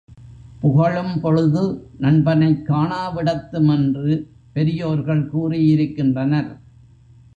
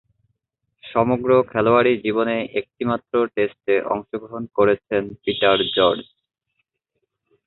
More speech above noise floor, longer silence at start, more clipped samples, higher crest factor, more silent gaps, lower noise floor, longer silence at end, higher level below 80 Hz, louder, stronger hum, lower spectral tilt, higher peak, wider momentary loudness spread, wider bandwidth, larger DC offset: second, 30 dB vs 56 dB; second, 0.1 s vs 0.85 s; neither; about the same, 14 dB vs 18 dB; neither; second, -48 dBFS vs -76 dBFS; second, 0.8 s vs 1.45 s; first, -48 dBFS vs -56 dBFS; about the same, -19 LUFS vs -20 LUFS; neither; about the same, -9.5 dB/octave vs -10 dB/octave; about the same, -4 dBFS vs -2 dBFS; second, 6 LU vs 9 LU; first, 7 kHz vs 4.3 kHz; neither